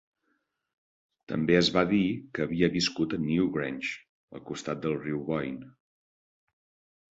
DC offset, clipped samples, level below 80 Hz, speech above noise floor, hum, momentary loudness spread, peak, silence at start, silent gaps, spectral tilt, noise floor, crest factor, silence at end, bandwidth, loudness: under 0.1%; under 0.1%; -58 dBFS; 48 dB; none; 15 LU; -8 dBFS; 1.3 s; 4.09-4.28 s; -5.5 dB/octave; -77 dBFS; 22 dB; 1.45 s; 8 kHz; -28 LUFS